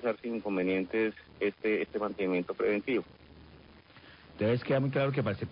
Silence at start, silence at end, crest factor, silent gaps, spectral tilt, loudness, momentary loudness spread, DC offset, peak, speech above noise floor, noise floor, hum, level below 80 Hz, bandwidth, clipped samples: 0 s; 0 s; 14 dB; none; -6 dB/octave; -31 LUFS; 6 LU; under 0.1%; -18 dBFS; 24 dB; -55 dBFS; none; -62 dBFS; 5.2 kHz; under 0.1%